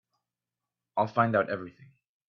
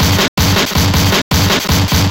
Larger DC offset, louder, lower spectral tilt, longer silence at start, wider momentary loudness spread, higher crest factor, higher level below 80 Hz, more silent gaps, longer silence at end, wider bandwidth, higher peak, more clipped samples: second, under 0.1% vs 0.2%; second, -29 LUFS vs -12 LUFS; first, -8.5 dB/octave vs -4 dB/octave; first, 0.95 s vs 0 s; first, 12 LU vs 1 LU; first, 22 dB vs 10 dB; second, -74 dBFS vs -22 dBFS; second, none vs 0.28-0.37 s, 1.22-1.31 s; first, 0.6 s vs 0 s; second, 6.4 kHz vs 17 kHz; second, -10 dBFS vs -2 dBFS; neither